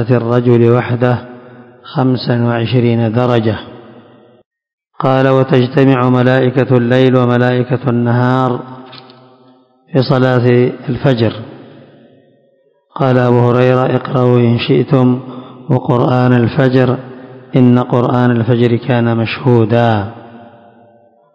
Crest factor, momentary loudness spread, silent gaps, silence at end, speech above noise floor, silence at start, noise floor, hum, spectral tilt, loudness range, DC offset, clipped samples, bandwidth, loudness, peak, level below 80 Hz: 12 dB; 10 LU; 4.46-4.51 s, 4.73-4.78 s; 0.9 s; 43 dB; 0 s; -54 dBFS; none; -9.5 dB/octave; 4 LU; under 0.1%; 0.8%; 5.8 kHz; -12 LUFS; 0 dBFS; -48 dBFS